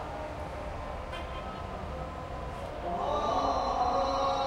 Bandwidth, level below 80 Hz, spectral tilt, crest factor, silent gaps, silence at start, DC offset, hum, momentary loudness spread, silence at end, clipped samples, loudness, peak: 13.5 kHz; -44 dBFS; -5.5 dB/octave; 16 dB; none; 0 s; under 0.1%; none; 10 LU; 0 s; under 0.1%; -33 LUFS; -18 dBFS